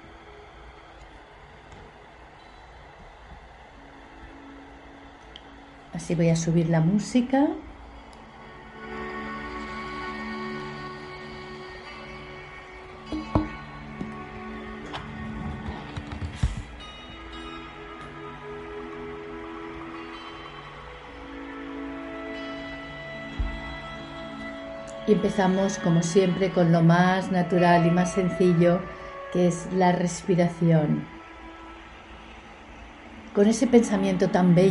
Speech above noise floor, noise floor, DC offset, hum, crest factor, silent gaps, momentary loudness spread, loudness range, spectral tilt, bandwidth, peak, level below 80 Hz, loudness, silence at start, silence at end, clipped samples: 27 dB; -48 dBFS; under 0.1%; none; 22 dB; none; 25 LU; 18 LU; -6.5 dB/octave; 11.5 kHz; -4 dBFS; -46 dBFS; -26 LUFS; 0 s; 0 s; under 0.1%